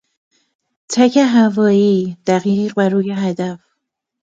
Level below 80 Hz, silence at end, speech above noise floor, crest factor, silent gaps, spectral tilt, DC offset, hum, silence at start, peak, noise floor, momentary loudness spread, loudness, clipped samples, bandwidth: -64 dBFS; 0.8 s; 60 dB; 16 dB; none; -6 dB/octave; under 0.1%; none; 0.9 s; 0 dBFS; -74 dBFS; 10 LU; -15 LUFS; under 0.1%; 9 kHz